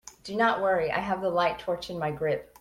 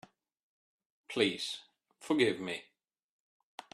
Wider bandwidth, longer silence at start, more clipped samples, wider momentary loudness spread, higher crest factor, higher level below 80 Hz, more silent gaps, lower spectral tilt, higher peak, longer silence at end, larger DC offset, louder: first, 16 kHz vs 13 kHz; second, 0.05 s vs 1.1 s; neither; second, 8 LU vs 23 LU; second, 18 dB vs 24 dB; first, -58 dBFS vs -80 dBFS; neither; about the same, -5 dB/octave vs -4 dB/octave; about the same, -10 dBFS vs -12 dBFS; second, 0.15 s vs 1.1 s; neither; first, -28 LUFS vs -33 LUFS